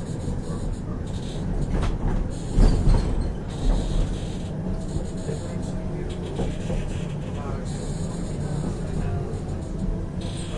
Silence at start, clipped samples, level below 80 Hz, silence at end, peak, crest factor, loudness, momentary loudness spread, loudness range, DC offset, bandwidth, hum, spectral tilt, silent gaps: 0 s; under 0.1%; -28 dBFS; 0 s; -6 dBFS; 20 dB; -28 LUFS; 7 LU; 4 LU; under 0.1%; 11 kHz; none; -7 dB/octave; none